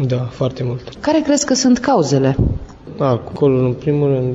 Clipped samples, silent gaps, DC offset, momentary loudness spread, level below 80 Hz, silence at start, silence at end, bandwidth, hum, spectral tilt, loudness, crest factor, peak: under 0.1%; none; under 0.1%; 9 LU; -34 dBFS; 0 s; 0 s; 8 kHz; none; -6 dB/octave; -16 LUFS; 12 dB; -4 dBFS